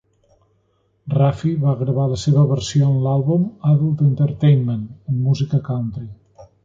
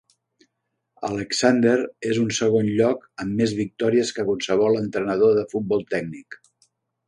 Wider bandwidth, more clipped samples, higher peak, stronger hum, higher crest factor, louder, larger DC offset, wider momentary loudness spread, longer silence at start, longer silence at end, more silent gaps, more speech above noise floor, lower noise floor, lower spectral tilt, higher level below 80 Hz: second, 7.6 kHz vs 11 kHz; neither; about the same, -4 dBFS vs -4 dBFS; neither; about the same, 14 dB vs 18 dB; first, -18 LUFS vs -22 LUFS; neither; about the same, 9 LU vs 10 LU; about the same, 1.05 s vs 1 s; second, 0.2 s vs 0.75 s; neither; second, 46 dB vs 56 dB; second, -63 dBFS vs -78 dBFS; first, -8 dB/octave vs -5 dB/octave; first, -48 dBFS vs -60 dBFS